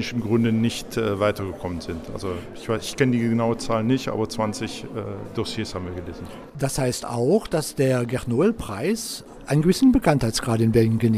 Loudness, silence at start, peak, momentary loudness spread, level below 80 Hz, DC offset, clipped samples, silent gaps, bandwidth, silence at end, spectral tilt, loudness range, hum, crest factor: -23 LUFS; 0 s; -6 dBFS; 13 LU; -44 dBFS; under 0.1%; under 0.1%; none; 15.5 kHz; 0 s; -6 dB/octave; 6 LU; none; 18 dB